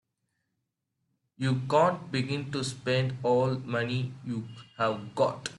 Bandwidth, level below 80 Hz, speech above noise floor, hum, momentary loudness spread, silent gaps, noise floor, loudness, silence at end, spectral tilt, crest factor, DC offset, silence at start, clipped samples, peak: 11.5 kHz; -66 dBFS; 53 dB; none; 10 LU; none; -82 dBFS; -29 LUFS; 0 s; -6 dB/octave; 18 dB; under 0.1%; 1.4 s; under 0.1%; -12 dBFS